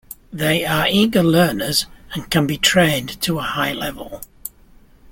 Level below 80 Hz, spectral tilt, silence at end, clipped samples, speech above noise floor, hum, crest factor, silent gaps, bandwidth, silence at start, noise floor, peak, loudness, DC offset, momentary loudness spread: -44 dBFS; -4 dB/octave; 0.65 s; under 0.1%; 30 dB; none; 18 dB; none; 17 kHz; 0.1 s; -48 dBFS; -2 dBFS; -18 LUFS; under 0.1%; 18 LU